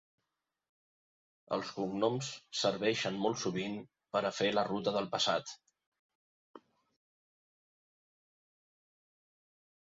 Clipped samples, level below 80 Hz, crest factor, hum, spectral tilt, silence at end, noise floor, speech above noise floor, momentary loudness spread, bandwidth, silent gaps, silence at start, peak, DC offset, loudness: under 0.1%; -76 dBFS; 22 dB; none; -3 dB/octave; 3.4 s; -88 dBFS; 53 dB; 8 LU; 7.6 kHz; 5.86-5.92 s, 5.99-6.09 s, 6.15-6.54 s; 1.5 s; -18 dBFS; under 0.1%; -34 LUFS